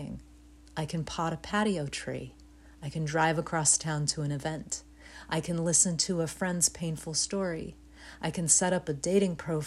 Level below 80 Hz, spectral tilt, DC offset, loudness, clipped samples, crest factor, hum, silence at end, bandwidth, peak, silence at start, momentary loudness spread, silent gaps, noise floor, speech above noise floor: -54 dBFS; -3.5 dB/octave; under 0.1%; -29 LUFS; under 0.1%; 22 dB; none; 0 s; 13.5 kHz; -10 dBFS; 0 s; 16 LU; none; -54 dBFS; 24 dB